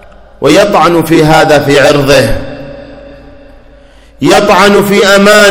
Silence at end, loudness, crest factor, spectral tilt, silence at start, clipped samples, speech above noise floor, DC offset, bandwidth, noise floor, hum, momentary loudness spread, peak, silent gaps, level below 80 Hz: 0 s; -6 LUFS; 6 dB; -4.5 dB/octave; 0.4 s; 9%; 31 dB; under 0.1%; over 20 kHz; -36 dBFS; none; 10 LU; 0 dBFS; none; -28 dBFS